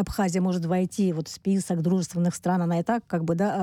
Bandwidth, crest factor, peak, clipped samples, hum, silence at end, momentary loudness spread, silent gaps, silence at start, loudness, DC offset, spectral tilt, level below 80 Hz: 14.5 kHz; 14 dB; -12 dBFS; under 0.1%; none; 0 s; 2 LU; none; 0 s; -26 LUFS; under 0.1%; -6.5 dB/octave; -52 dBFS